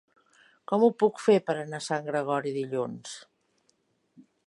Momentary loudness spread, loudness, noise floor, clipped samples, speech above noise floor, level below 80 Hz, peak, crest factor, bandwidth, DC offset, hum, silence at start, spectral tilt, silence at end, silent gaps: 14 LU; -27 LUFS; -71 dBFS; under 0.1%; 45 dB; -82 dBFS; -10 dBFS; 20 dB; 11.5 kHz; under 0.1%; none; 0.7 s; -5.5 dB/octave; 0.25 s; none